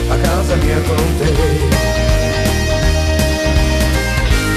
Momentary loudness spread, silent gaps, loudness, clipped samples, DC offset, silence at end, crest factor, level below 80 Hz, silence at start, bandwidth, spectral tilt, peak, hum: 1 LU; none; -15 LUFS; under 0.1%; under 0.1%; 0 s; 12 dB; -16 dBFS; 0 s; 14 kHz; -5 dB/octave; -2 dBFS; none